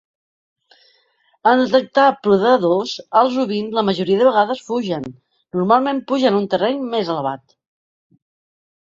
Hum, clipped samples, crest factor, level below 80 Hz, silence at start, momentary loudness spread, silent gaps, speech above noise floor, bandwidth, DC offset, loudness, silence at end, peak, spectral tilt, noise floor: none; under 0.1%; 16 dB; -62 dBFS; 1.45 s; 9 LU; none; 44 dB; 7.6 kHz; under 0.1%; -17 LUFS; 1.5 s; -2 dBFS; -6 dB/octave; -61 dBFS